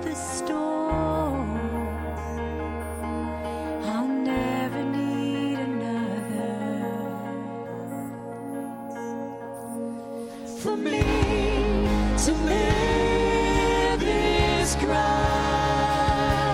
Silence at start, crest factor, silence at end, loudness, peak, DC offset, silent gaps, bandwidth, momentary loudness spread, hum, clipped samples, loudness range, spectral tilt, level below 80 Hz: 0 s; 18 dB; 0 s; -26 LUFS; -8 dBFS; under 0.1%; none; 16.5 kHz; 12 LU; none; under 0.1%; 10 LU; -5 dB/octave; -34 dBFS